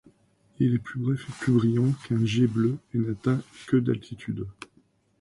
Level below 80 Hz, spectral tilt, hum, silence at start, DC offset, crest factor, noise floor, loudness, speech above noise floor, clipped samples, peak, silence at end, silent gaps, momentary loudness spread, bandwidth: -58 dBFS; -8 dB/octave; none; 0.6 s; under 0.1%; 16 dB; -64 dBFS; -26 LUFS; 39 dB; under 0.1%; -12 dBFS; 0.7 s; none; 12 LU; 11.5 kHz